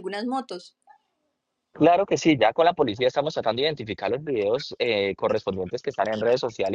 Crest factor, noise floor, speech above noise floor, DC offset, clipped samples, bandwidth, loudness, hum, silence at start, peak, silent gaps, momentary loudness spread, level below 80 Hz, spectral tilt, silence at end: 18 dB; -78 dBFS; 54 dB; under 0.1%; under 0.1%; 9.6 kHz; -24 LUFS; none; 0 s; -6 dBFS; none; 10 LU; -62 dBFS; -5 dB/octave; 0 s